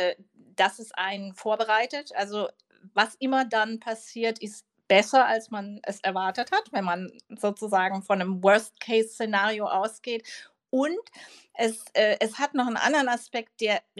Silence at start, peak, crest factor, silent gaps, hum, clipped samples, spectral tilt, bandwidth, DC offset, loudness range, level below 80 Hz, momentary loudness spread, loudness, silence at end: 0 s; -6 dBFS; 22 dB; none; none; under 0.1%; -3.5 dB/octave; 13 kHz; under 0.1%; 3 LU; -88 dBFS; 13 LU; -26 LUFS; 0.2 s